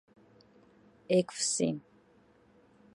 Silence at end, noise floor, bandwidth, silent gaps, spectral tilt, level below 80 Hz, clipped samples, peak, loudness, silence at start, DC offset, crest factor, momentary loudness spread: 1.15 s; -64 dBFS; 11.5 kHz; none; -4 dB/octave; -76 dBFS; under 0.1%; -14 dBFS; -31 LUFS; 1.1 s; under 0.1%; 20 dB; 6 LU